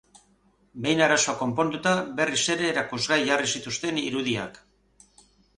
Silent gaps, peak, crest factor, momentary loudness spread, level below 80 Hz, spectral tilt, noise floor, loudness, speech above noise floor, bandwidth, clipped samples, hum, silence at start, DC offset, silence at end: none; -6 dBFS; 22 dB; 8 LU; -62 dBFS; -3 dB/octave; -63 dBFS; -24 LUFS; 38 dB; 11.5 kHz; under 0.1%; 50 Hz at -60 dBFS; 0.75 s; under 0.1%; 1.05 s